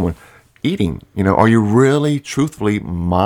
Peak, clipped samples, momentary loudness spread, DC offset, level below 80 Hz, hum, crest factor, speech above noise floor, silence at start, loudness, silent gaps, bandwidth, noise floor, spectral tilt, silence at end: 0 dBFS; under 0.1%; 10 LU; under 0.1%; -38 dBFS; none; 16 dB; 31 dB; 0 s; -16 LUFS; none; 16.5 kHz; -46 dBFS; -7 dB/octave; 0 s